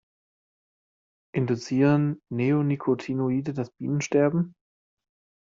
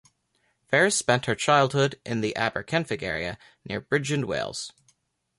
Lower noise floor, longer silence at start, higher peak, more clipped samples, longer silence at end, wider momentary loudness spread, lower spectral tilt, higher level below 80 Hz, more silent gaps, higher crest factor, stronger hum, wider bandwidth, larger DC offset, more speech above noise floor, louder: first, under -90 dBFS vs -71 dBFS; first, 1.35 s vs 0.7 s; about the same, -10 dBFS vs -8 dBFS; neither; first, 1 s vs 0.7 s; second, 9 LU vs 14 LU; first, -8 dB/octave vs -4 dB/octave; second, -66 dBFS vs -58 dBFS; neither; about the same, 16 dB vs 20 dB; neither; second, 7.6 kHz vs 11.5 kHz; neither; first, over 66 dB vs 46 dB; about the same, -26 LUFS vs -25 LUFS